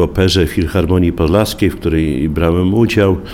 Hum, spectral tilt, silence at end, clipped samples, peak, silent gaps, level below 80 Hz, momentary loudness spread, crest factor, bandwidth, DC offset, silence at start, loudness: none; -6.5 dB/octave; 0 s; under 0.1%; 0 dBFS; none; -26 dBFS; 3 LU; 12 dB; 16.5 kHz; under 0.1%; 0 s; -14 LUFS